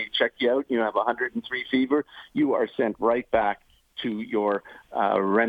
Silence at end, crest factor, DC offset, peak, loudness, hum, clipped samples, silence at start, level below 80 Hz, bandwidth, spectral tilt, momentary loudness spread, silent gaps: 0 s; 18 dB; under 0.1%; -8 dBFS; -26 LUFS; none; under 0.1%; 0 s; -60 dBFS; 5 kHz; -7 dB/octave; 8 LU; none